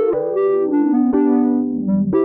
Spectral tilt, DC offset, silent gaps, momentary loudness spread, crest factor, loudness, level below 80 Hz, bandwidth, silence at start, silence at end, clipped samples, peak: -13.5 dB/octave; under 0.1%; none; 4 LU; 8 dB; -17 LUFS; -52 dBFS; 2.9 kHz; 0 s; 0 s; under 0.1%; -8 dBFS